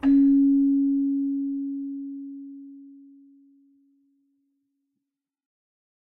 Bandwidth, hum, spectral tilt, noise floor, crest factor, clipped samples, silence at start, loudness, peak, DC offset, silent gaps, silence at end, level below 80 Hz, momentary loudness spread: 3 kHz; none; -7 dB/octave; -84 dBFS; 14 dB; under 0.1%; 0.05 s; -23 LUFS; -12 dBFS; under 0.1%; none; 3.15 s; -60 dBFS; 23 LU